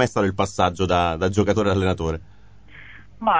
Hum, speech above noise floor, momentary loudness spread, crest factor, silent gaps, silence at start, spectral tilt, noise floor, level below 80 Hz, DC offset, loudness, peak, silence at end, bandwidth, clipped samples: none; 26 dB; 8 LU; 18 dB; none; 0 s; -6 dB/octave; -47 dBFS; -38 dBFS; 0.5%; -21 LUFS; -4 dBFS; 0 s; 8 kHz; under 0.1%